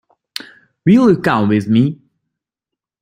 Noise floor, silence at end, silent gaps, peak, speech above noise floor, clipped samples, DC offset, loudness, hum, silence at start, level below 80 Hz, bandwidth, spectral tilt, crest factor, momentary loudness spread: -84 dBFS; 1.1 s; none; 0 dBFS; 72 dB; under 0.1%; under 0.1%; -14 LUFS; none; 0.85 s; -52 dBFS; 15.5 kHz; -7.5 dB/octave; 16 dB; 19 LU